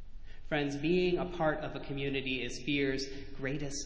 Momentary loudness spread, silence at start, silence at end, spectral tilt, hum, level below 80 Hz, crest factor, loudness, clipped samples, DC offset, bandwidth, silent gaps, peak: 8 LU; 0 s; 0 s; -5 dB/octave; none; -50 dBFS; 16 dB; -34 LUFS; under 0.1%; under 0.1%; 8 kHz; none; -18 dBFS